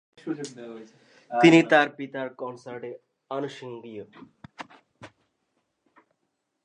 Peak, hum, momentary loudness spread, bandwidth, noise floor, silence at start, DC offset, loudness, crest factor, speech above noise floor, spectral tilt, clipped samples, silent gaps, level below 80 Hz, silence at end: -2 dBFS; none; 27 LU; 9.4 kHz; -78 dBFS; 0.25 s; under 0.1%; -23 LUFS; 26 dB; 53 dB; -5.5 dB/octave; under 0.1%; none; -76 dBFS; 1.6 s